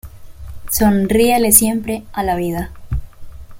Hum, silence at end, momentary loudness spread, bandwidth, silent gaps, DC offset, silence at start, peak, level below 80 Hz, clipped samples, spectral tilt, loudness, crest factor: none; 0 s; 17 LU; 17 kHz; none; under 0.1%; 0.05 s; 0 dBFS; -32 dBFS; under 0.1%; -4 dB/octave; -15 LUFS; 18 dB